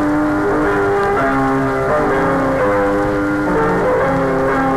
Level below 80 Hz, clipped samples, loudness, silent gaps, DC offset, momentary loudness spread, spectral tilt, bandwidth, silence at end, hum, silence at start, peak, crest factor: -34 dBFS; under 0.1%; -15 LUFS; none; under 0.1%; 1 LU; -7 dB/octave; 15 kHz; 0 s; none; 0 s; -4 dBFS; 10 dB